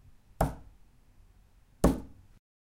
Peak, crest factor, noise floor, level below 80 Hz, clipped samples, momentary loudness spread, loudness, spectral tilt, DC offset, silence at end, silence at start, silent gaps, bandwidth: -10 dBFS; 26 dB; -60 dBFS; -42 dBFS; under 0.1%; 22 LU; -32 LUFS; -7 dB/octave; under 0.1%; 0.65 s; 0.4 s; none; 16.5 kHz